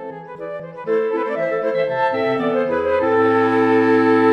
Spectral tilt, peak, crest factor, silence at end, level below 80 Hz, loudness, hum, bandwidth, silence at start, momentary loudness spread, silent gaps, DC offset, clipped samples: -7.5 dB/octave; -4 dBFS; 14 dB; 0 s; -58 dBFS; -18 LUFS; none; 6.6 kHz; 0 s; 16 LU; none; under 0.1%; under 0.1%